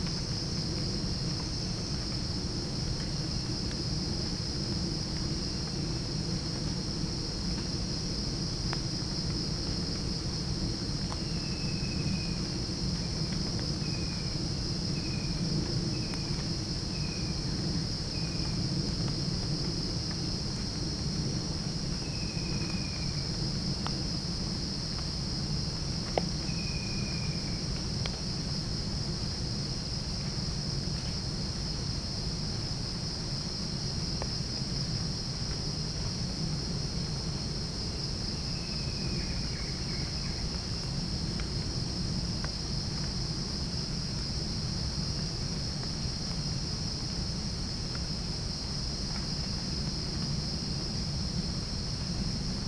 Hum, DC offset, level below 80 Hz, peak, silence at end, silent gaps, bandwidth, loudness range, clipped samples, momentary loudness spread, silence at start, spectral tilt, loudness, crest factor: none; under 0.1%; -40 dBFS; -10 dBFS; 0 s; none; 10.5 kHz; 1 LU; under 0.1%; 2 LU; 0 s; -4.5 dB/octave; -33 LUFS; 24 dB